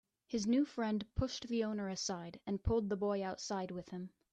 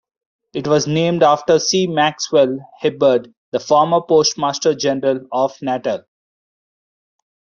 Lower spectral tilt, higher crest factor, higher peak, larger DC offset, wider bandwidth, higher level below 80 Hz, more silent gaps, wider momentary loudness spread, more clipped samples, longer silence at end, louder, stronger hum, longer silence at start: about the same, -5.5 dB/octave vs -4.5 dB/octave; about the same, 14 dB vs 16 dB; second, -24 dBFS vs -2 dBFS; neither; first, 9.2 kHz vs 7.4 kHz; first, -54 dBFS vs -62 dBFS; second, none vs 3.37-3.52 s; about the same, 10 LU vs 9 LU; neither; second, 0.25 s vs 1.6 s; second, -38 LUFS vs -17 LUFS; neither; second, 0.3 s vs 0.55 s